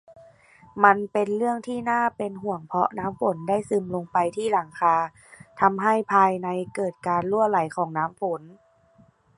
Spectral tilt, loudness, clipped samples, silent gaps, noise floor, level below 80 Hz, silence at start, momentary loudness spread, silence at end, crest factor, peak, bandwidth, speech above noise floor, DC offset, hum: -6.5 dB/octave; -24 LUFS; under 0.1%; none; -58 dBFS; -64 dBFS; 0.1 s; 10 LU; 0.85 s; 22 dB; -2 dBFS; 11.5 kHz; 35 dB; under 0.1%; none